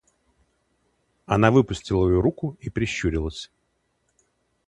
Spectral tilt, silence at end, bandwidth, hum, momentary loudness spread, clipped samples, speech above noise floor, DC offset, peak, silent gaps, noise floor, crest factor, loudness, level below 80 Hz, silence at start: -6.5 dB/octave; 1.25 s; 10.5 kHz; none; 14 LU; under 0.1%; 50 dB; under 0.1%; -2 dBFS; none; -72 dBFS; 24 dB; -23 LUFS; -40 dBFS; 1.3 s